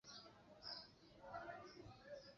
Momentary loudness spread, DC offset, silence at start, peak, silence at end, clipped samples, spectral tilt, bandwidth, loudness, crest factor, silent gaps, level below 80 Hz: 10 LU; under 0.1%; 0.05 s; -40 dBFS; 0 s; under 0.1%; -2 dB/octave; 7.2 kHz; -57 LUFS; 18 dB; none; -78 dBFS